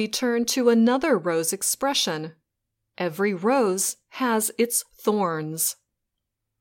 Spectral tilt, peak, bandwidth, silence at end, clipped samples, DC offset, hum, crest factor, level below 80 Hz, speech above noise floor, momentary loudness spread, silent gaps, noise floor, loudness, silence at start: -3 dB/octave; -6 dBFS; 17 kHz; 0.9 s; under 0.1%; under 0.1%; none; 18 dB; -68 dBFS; 58 dB; 8 LU; none; -82 dBFS; -23 LUFS; 0 s